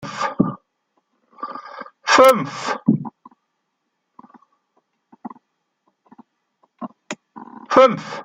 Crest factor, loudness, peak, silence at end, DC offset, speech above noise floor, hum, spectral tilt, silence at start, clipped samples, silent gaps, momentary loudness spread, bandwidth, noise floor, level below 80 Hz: 22 dB; -17 LUFS; 0 dBFS; 0 s; under 0.1%; 59 dB; none; -5 dB/octave; 0 s; under 0.1%; none; 27 LU; 16 kHz; -74 dBFS; -64 dBFS